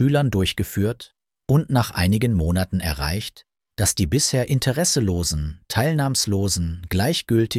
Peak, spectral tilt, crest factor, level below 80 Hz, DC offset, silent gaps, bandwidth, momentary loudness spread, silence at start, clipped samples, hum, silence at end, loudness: -6 dBFS; -4.5 dB/octave; 16 dB; -36 dBFS; under 0.1%; none; 16 kHz; 7 LU; 0 s; under 0.1%; none; 0 s; -21 LUFS